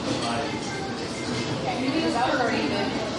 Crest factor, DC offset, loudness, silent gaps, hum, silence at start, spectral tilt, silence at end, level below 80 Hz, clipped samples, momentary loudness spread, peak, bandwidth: 14 dB; under 0.1%; -26 LUFS; none; none; 0 s; -4.5 dB/octave; 0 s; -52 dBFS; under 0.1%; 7 LU; -12 dBFS; 11.5 kHz